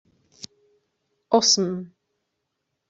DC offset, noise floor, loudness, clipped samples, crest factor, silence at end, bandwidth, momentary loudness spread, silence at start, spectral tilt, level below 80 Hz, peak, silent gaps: under 0.1%; -79 dBFS; -20 LUFS; under 0.1%; 24 dB; 1.05 s; 8.2 kHz; 25 LU; 1.3 s; -3 dB/octave; -72 dBFS; -4 dBFS; none